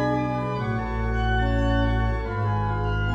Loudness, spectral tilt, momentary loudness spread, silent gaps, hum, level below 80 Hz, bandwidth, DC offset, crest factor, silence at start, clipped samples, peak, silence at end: -25 LUFS; -8 dB/octave; 4 LU; none; none; -28 dBFS; 7.6 kHz; under 0.1%; 12 dB; 0 s; under 0.1%; -12 dBFS; 0 s